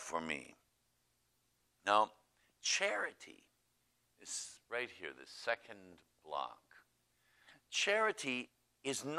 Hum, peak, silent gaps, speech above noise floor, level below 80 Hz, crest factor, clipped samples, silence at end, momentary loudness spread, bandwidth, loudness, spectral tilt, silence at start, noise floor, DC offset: 60 Hz at -85 dBFS; -16 dBFS; none; 40 dB; -82 dBFS; 26 dB; under 0.1%; 0 s; 21 LU; 15.5 kHz; -38 LUFS; -1.5 dB/octave; 0 s; -79 dBFS; under 0.1%